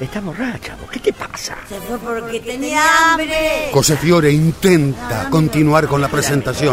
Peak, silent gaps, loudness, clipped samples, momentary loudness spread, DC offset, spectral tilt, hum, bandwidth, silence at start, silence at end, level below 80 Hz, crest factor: 0 dBFS; none; -15 LUFS; under 0.1%; 13 LU; under 0.1%; -5 dB/octave; none; 16 kHz; 0 s; 0 s; -38 dBFS; 16 dB